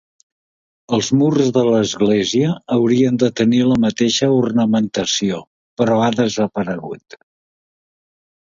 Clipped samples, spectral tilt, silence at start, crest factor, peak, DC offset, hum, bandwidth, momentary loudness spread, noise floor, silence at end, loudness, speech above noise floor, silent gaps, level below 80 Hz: under 0.1%; -5.5 dB/octave; 0.9 s; 16 dB; -2 dBFS; under 0.1%; none; 7.6 kHz; 9 LU; under -90 dBFS; 1.5 s; -16 LUFS; over 74 dB; 5.47-5.77 s; -54 dBFS